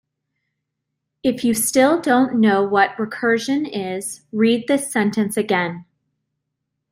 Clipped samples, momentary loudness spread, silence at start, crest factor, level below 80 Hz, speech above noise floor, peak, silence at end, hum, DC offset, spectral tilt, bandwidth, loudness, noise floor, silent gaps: under 0.1%; 10 LU; 1.25 s; 18 dB; -62 dBFS; 60 dB; -2 dBFS; 1.1 s; none; under 0.1%; -4 dB/octave; 16 kHz; -19 LUFS; -78 dBFS; none